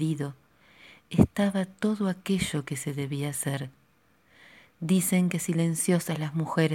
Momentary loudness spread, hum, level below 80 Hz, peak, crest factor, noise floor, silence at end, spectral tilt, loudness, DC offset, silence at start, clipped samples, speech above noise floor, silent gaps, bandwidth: 9 LU; none; -52 dBFS; -4 dBFS; 24 dB; -65 dBFS; 0 s; -5.5 dB/octave; -28 LUFS; under 0.1%; 0 s; under 0.1%; 38 dB; none; 17 kHz